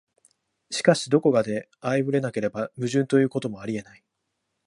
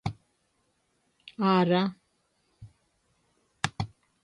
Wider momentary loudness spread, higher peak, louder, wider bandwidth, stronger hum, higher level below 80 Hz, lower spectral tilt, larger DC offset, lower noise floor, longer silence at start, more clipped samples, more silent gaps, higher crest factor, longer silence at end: second, 11 LU vs 15 LU; first, -4 dBFS vs -8 dBFS; first, -24 LUFS vs -28 LUFS; about the same, 11.5 kHz vs 11 kHz; neither; second, -66 dBFS vs -58 dBFS; about the same, -5.5 dB/octave vs -6 dB/octave; neither; first, -79 dBFS vs -73 dBFS; first, 0.7 s vs 0.05 s; neither; neither; about the same, 22 dB vs 24 dB; first, 0.85 s vs 0.35 s